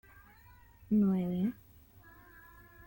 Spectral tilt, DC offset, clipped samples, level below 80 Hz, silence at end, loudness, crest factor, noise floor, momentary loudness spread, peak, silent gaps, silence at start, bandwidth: -10 dB/octave; under 0.1%; under 0.1%; -62 dBFS; 1.35 s; -32 LUFS; 16 dB; -59 dBFS; 26 LU; -20 dBFS; none; 0.9 s; 17 kHz